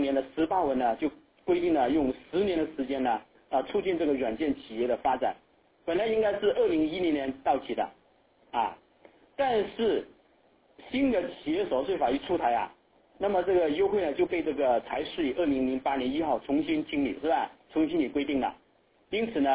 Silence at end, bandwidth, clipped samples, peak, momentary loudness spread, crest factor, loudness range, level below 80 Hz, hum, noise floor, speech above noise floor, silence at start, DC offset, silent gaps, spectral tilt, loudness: 0 s; 4 kHz; under 0.1%; -14 dBFS; 7 LU; 16 dB; 3 LU; -58 dBFS; none; -65 dBFS; 38 dB; 0 s; under 0.1%; none; -9 dB/octave; -29 LUFS